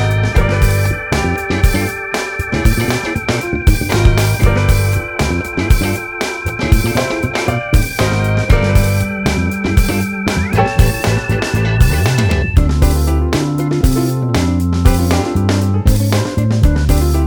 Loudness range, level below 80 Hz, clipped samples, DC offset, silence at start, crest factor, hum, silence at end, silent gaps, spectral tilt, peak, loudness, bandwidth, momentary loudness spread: 2 LU; -18 dBFS; 0.3%; under 0.1%; 0 s; 12 dB; none; 0 s; none; -6 dB/octave; 0 dBFS; -15 LUFS; over 20 kHz; 5 LU